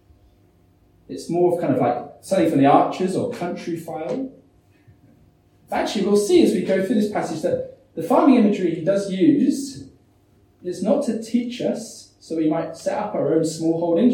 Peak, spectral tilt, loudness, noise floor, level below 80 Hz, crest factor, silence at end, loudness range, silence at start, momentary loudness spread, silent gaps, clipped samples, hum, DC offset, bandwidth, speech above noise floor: -2 dBFS; -6 dB/octave; -21 LUFS; -57 dBFS; -62 dBFS; 18 dB; 0 s; 6 LU; 1.1 s; 14 LU; none; under 0.1%; none; under 0.1%; 16.5 kHz; 37 dB